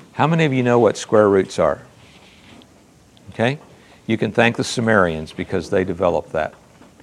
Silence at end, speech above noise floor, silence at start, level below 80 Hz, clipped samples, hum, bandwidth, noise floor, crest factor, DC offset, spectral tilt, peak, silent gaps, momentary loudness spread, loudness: 0.55 s; 32 dB; 0.15 s; -54 dBFS; under 0.1%; none; 12.5 kHz; -50 dBFS; 20 dB; under 0.1%; -6 dB/octave; 0 dBFS; none; 12 LU; -18 LUFS